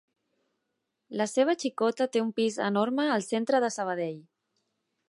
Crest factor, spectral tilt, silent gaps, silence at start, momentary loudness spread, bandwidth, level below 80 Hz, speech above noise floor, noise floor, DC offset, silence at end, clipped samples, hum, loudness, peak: 18 dB; -4.5 dB/octave; none; 1.1 s; 7 LU; 11.5 kHz; -84 dBFS; 54 dB; -82 dBFS; under 0.1%; 0.9 s; under 0.1%; none; -28 LUFS; -12 dBFS